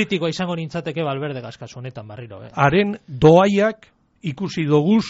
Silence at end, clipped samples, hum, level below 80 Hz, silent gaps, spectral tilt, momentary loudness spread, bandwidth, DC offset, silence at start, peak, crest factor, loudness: 0 s; under 0.1%; none; -50 dBFS; none; -5.5 dB/octave; 21 LU; 8 kHz; under 0.1%; 0 s; -2 dBFS; 18 dB; -19 LUFS